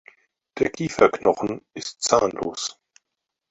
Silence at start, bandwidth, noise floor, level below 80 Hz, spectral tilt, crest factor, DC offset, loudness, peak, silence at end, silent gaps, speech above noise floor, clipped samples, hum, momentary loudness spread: 0.55 s; 8.4 kHz; -82 dBFS; -56 dBFS; -3.5 dB/octave; 22 dB; under 0.1%; -23 LUFS; -2 dBFS; 0.8 s; none; 60 dB; under 0.1%; none; 13 LU